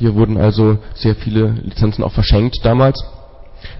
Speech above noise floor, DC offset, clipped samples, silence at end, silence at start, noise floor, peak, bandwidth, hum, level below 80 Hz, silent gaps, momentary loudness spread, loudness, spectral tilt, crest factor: 20 dB; under 0.1%; under 0.1%; 0 s; 0 s; -33 dBFS; -2 dBFS; 5.8 kHz; none; -24 dBFS; none; 5 LU; -15 LUFS; -11 dB/octave; 12 dB